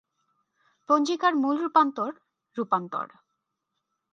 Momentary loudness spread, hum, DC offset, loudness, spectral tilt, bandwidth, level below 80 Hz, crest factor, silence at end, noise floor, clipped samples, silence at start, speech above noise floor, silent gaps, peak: 12 LU; none; under 0.1%; -25 LUFS; -4.5 dB/octave; 7.8 kHz; -84 dBFS; 20 dB; 1.1 s; -82 dBFS; under 0.1%; 0.9 s; 57 dB; none; -8 dBFS